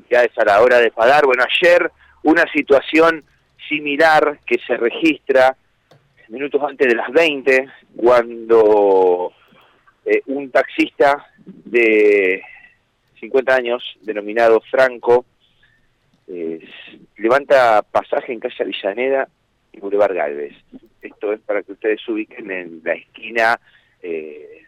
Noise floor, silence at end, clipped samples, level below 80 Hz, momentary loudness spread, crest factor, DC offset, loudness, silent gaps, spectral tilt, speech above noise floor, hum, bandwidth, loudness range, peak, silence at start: -60 dBFS; 0.15 s; under 0.1%; -58 dBFS; 15 LU; 12 dB; under 0.1%; -16 LUFS; none; -4.5 dB/octave; 44 dB; none; 14 kHz; 7 LU; -4 dBFS; 0.1 s